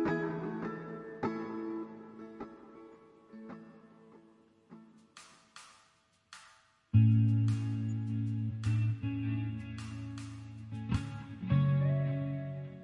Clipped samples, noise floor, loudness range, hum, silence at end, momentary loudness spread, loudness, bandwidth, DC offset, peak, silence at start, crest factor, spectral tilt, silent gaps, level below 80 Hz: under 0.1%; -70 dBFS; 23 LU; none; 0 s; 25 LU; -34 LUFS; 10.5 kHz; under 0.1%; -14 dBFS; 0 s; 20 dB; -8.5 dB/octave; none; -60 dBFS